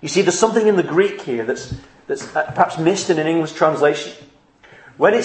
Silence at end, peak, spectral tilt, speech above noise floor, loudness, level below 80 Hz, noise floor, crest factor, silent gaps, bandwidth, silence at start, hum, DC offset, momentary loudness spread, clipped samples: 0 s; 0 dBFS; -4.5 dB/octave; 30 dB; -18 LUFS; -54 dBFS; -48 dBFS; 18 dB; none; 8.8 kHz; 0 s; none; under 0.1%; 12 LU; under 0.1%